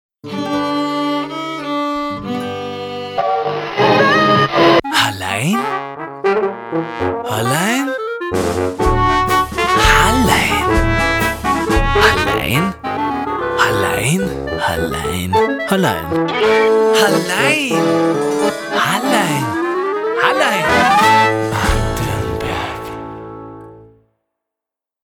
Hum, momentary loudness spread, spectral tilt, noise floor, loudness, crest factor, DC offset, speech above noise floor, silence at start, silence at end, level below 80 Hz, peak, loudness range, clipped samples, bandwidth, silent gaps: none; 11 LU; -4.5 dB/octave; -85 dBFS; -15 LUFS; 16 dB; under 0.1%; 70 dB; 0.25 s; 1.2 s; -30 dBFS; 0 dBFS; 5 LU; under 0.1%; over 20 kHz; none